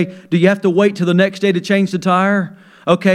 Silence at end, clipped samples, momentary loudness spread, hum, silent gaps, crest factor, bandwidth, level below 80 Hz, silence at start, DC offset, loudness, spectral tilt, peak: 0 s; under 0.1%; 5 LU; none; none; 14 dB; 11.5 kHz; -64 dBFS; 0 s; under 0.1%; -15 LUFS; -6.5 dB/octave; 0 dBFS